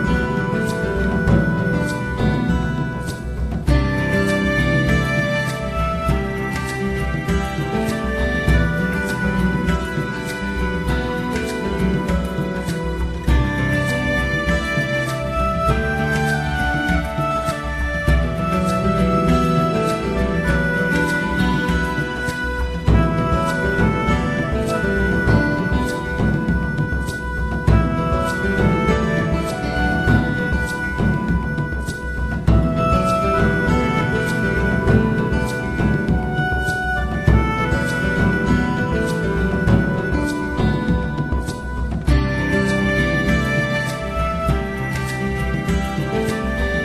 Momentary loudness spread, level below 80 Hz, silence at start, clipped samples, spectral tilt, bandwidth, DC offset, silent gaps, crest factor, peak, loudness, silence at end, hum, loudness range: 6 LU; -26 dBFS; 0 s; under 0.1%; -6.5 dB/octave; 14 kHz; under 0.1%; none; 16 dB; -2 dBFS; -20 LUFS; 0 s; none; 2 LU